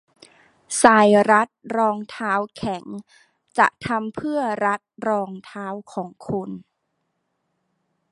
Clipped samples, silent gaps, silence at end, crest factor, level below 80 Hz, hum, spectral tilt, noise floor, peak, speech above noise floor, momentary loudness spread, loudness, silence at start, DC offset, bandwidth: under 0.1%; none; 1.5 s; 22 dB; -60 dBFS; none; -4.5 dB/octave; -74 dBFS; 0 dBFS; 53 dB; 18 LU; -20 LUFS; 0.7 s; under 0.1%; 11.5 kHz